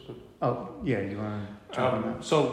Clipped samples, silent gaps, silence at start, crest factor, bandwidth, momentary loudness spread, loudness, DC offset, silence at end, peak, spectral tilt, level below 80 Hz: under 0.1%; none; 0 s; 20 dB; 12.5 kHz; 10 LU; -30 LUFS; under 0.1%; 0 s; -10 dBFS; -6 dB/octave; -58 dBFS